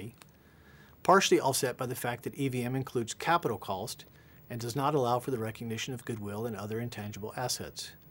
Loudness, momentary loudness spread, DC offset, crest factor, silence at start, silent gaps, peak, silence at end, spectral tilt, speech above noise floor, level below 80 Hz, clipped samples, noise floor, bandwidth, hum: -32 LUFS; 14 LU; under 0.1%; 22 dB; 0 s; none; -10 dBFS; 0 s; -4.5 dB/octave; 26 dB; -66 dBFS; under 0.1%; -58 dBFS; 16 kHz; none